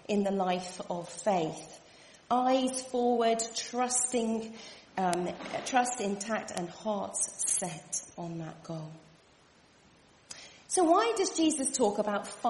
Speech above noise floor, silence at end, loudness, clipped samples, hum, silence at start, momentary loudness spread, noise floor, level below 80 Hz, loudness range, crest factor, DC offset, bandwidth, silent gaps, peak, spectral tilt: 31 dB; 0 s; -31 LUFS; under 0.1%; none; 0.1 s; 15 LU; -62 dBFS; -72 dBFS; 5 LU; 24 dB; under 0.1%; 11.5 kHz; none; -8 dBFS; -3.5 dB/octave